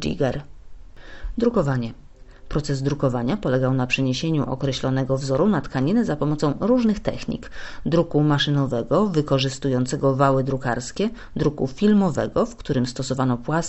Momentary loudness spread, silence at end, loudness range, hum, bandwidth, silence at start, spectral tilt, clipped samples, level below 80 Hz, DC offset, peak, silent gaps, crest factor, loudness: 8 LU; 0 s; 3 LU; none; 8.2 kHz; 0 s; -6.5 dB/octave; under 0.1%; -40 dBFS; under 0.1%; -4 dBFS; none; 18 dB; -22 LUFS